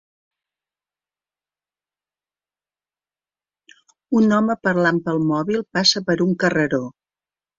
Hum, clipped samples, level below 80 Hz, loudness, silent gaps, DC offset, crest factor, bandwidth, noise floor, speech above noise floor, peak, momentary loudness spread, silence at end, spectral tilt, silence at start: 50 Hz at -55 dBFS; under 0.1%; -60 dBFS; -19 LUFS; none; under 0.1%; 20 dB; 7.6 kHz; under -90 dBFS; over 71 dB; -4 dBFS; 6 LU; 0.7 s; -5 dB/octave; 4.1 s